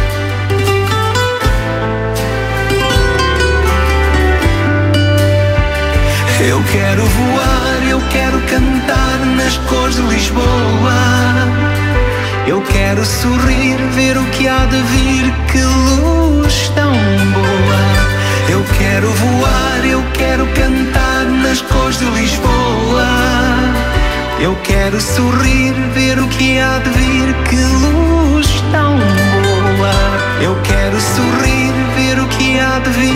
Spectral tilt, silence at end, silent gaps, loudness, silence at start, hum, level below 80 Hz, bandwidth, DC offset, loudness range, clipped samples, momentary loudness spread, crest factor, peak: -5 dB/octave; 0 s; none; -12 LUFS; 0 s; none; -18 dBFS; 16 kHz; under 0.1%; 1 LU; under 0.1%; 3 LU; 10 dB; 0 dBFS